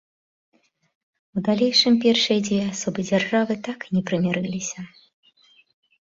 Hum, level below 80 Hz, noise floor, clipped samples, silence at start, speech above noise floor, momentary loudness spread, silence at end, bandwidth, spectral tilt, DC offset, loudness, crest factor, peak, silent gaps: none; -64 dBFS; -58 dBFS; under 0.1%; 1.35 s; 36 dB; 13 LU; 1.25 s; 7.8 kHz; -4.5 dB/octave; under 0.1%; -22 LUFS; 18 dB; -4 dBFS; none